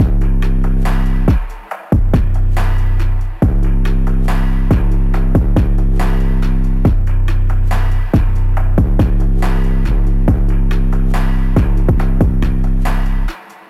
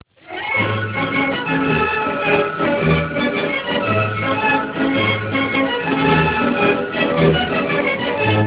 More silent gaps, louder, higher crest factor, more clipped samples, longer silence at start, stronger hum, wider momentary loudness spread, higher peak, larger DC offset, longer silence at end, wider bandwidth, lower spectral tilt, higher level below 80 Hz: neither; about the same, -16 LUFS vs -17 LUFS; second, 10 dB vs 18 dB; neither; second, 0 s vs 0.25 s; neither; about the same, 3 LU vs 4 LU; about the same, -2 dBFS vs 0 dBFS; neither; first, 0.3 s vs 0 s; first, 4.9 kHz vs 4 kHz; about the same, -8.5 dB/octave vs -9.5 dB/octave; first, -12 dBFS vs -40 dBFS